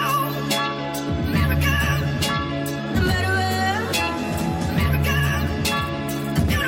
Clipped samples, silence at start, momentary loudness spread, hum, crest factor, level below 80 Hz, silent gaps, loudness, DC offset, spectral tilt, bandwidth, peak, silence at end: under 0.1%; 0 s; 5 LU; none; 16 dB; -32 dBFS; none; -22 LUFS; under 0.1%; -5 dB/octave; 17 kHz; -6 dBFS; 0 s